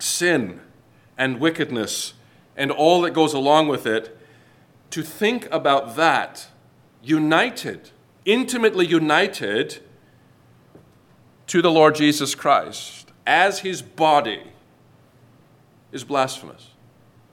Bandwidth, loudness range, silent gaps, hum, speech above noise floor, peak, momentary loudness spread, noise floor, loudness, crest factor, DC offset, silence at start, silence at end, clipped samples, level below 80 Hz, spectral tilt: 17.5 kHz; 3 LU; none; none; 34 dB; -2 dBFS; 16 LU; -54 dBFS; -20 LUFS; 20 dB; under 0.1%; 0 s; 0.8 s; under 0.1%; -70 dBFS; -4 dB/octave